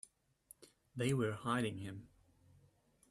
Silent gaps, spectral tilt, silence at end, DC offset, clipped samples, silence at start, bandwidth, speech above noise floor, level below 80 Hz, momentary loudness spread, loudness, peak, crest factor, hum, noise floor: none; -6 dB/octave; 1.05 s; under 0.1%; under 0.1%; 0.6 s; 14.5 kHz; 33 dB; -72 dBFS; 24 LU; -39 LUFS; -24 dBFS; 20 dB; none; -72 dBFS